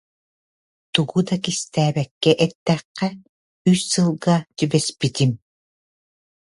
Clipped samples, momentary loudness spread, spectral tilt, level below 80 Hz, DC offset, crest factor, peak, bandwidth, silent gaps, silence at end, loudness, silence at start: under 0.1%; 6 LU; -5 dB/octave; -60 dBFS; under 0.1%; 22 dB; 0 dBFS; 11.5 kHz; 2.11-2.21 s, 2.55-2.66 s, 2.85-2.95 s, 3.29-3.65 s; 1.1 s; -21 LUFS; 0.95 s